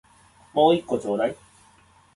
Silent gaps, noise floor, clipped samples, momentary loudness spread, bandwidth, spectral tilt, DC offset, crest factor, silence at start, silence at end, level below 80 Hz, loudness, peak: none; -56 dBFS; under 0.1%; 10 LU; 11.5 kHz; -6 dB/octave; under 0.1%; 20 dB; 0.55 s; 0.8 s; -62 dBFS; -23 LUFS; -6 dBFS